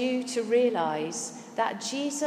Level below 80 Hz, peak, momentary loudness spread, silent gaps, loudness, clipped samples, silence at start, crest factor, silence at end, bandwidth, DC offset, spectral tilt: -88 dBFS; -12 dBFS; 9 LU; none; -28 LUFS; under 0.1%; 0 s; 16 dB; 0 s; 15 kHz; under 0.1%; -3 dB/octave